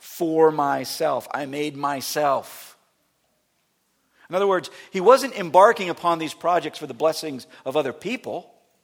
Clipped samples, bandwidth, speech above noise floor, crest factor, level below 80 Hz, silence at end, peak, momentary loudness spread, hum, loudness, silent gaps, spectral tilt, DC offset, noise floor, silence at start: under 0.1%; 18 kHz; 48 dB; 22 dB; -74 dBFS; 0.4 s; 0 dBFS; 15 LU; none; -22 LUFS; none; -4 dB/octave; under 0.1%; -69 dBFS; 0.05 s